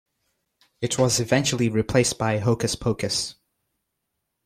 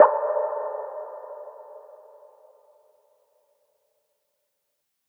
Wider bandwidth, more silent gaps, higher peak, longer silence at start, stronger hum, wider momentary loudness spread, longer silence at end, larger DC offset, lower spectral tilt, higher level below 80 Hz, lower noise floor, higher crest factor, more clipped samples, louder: first, 15.5 kHz vs 3.2 kHz; neither; second, -6 dBFS vs -2 dBFS; first, 0.8 s vs 0 s; neither; second, 6 LU vs 22 LU; second, 1.15 s vs 3.25 s; neither; about the same, -4.5 dB/octave vs -4.5 dB/octave; first, -50 dBFS vs under -90 dBFS; about the same, -79 dBFS vs -78 dBFS; second, 18 dB vs 26 dB; neither; first, -23 LUFS vs -27 LUFS